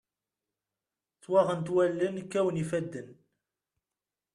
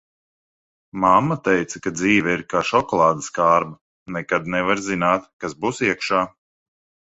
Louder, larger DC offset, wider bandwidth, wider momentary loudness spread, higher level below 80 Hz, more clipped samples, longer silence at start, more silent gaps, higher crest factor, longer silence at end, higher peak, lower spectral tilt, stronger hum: second, -29 LUFS vs -20 LUFS; neither; first, 11 kHz vs 8.2 kHz; second, 8 LU vs 11 LU; second, -72 dBFS vs -54 dBFS; neither; first, 1.3 s vs 0.95 s; second, none vs 3.81-4.06 s, 5.33-5.40 s; about the same, 20 dB vs 20 dB; first, 1.2 s vs 0.8 s; second, -12 dBFS vs -2 dBFS; first, -7 dB/octave vs -5 dB/octave; neither